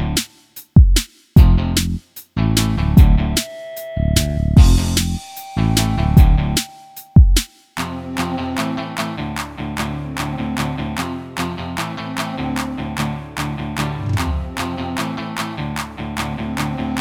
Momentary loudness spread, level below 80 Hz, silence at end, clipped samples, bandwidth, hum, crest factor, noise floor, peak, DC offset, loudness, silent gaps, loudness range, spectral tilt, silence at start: 13 LU; -20 dBFS; 0 s; under 0.1%; 18.5 kHz; none; 16 dB; -42 dBFS; 0 dBFS; under 0.1%; -19 LUFS; none; 8 LU; -5 dB/octave; 0 s